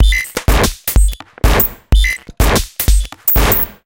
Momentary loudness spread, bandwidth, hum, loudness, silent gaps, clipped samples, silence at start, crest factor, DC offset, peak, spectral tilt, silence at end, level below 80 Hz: 5 LU; 17.5 kHz; none; -14 LUFS; none; under 0.1%; 0 s; 12 dB; under 0.1%; 0 dBFS; -4 dB/octave; 0.15 s; -14 dBFS